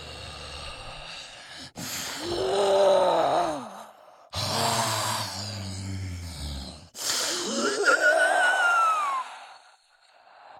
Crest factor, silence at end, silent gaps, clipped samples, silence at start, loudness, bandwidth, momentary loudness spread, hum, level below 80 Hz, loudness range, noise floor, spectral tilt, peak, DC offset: 18 dB; 0 s; none; under 0.1%; 0 s; -25 LUFS; 16.5 kHz; 18 LU; none; -50 dBFS; 6 LU; -59 dBFS; -2.5 dB/octave; -8 dBFS; under 0.1%